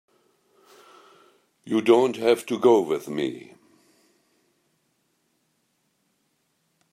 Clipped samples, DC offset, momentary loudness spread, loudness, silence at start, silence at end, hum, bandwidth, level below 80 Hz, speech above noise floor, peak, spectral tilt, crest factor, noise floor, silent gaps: under 0.1%; under 0.1%; 11 LU; -22 LUFS; 1.65 s; 3.55 s; none; 15 kHz; -76 dBFS; 50 dB; -6 dBFS; -5.5 dB/octave; 22 dB; -72 dBFS; none